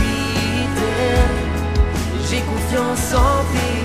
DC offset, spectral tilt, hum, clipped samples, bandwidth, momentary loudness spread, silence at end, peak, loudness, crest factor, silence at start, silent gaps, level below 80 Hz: 0.8%; -5 dB/octave; none; under 0.1%; 15.5 kHz; 4 LU; 0 s; -2 dBFS; -19 LUFS; 16 dB; 0 s; none; -22 dBFS